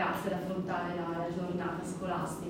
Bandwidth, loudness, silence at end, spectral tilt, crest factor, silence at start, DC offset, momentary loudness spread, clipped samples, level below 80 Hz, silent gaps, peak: 16 kHz; -35 LUFS; 0 s; -6 dB/octave; 16 dB; 0 s; under 0.1%; 1 LU; under 0.1%; -62 dBFS; none; -18 dBFS